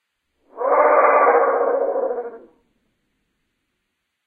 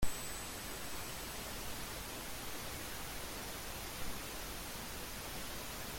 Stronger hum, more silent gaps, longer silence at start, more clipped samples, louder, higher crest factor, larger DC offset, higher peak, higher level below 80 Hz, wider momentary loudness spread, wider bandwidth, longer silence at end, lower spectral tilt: neither; neither; first, 0.55 s vs 0 s; neither; first, -17 LUFS vs -44 LUFS; about the same, 18 dB vs 20 dB; neither; first, -2 dBFS vs -22 dBFS; second, -68 dBFS vs -52 dBFS; first, 13 LU vs 1 LU; second, 2.6 kHz vs 17 kHz; first, 1.9 s vs 0 s; first, -7.5 dB/octave vs -2.5 dB/octave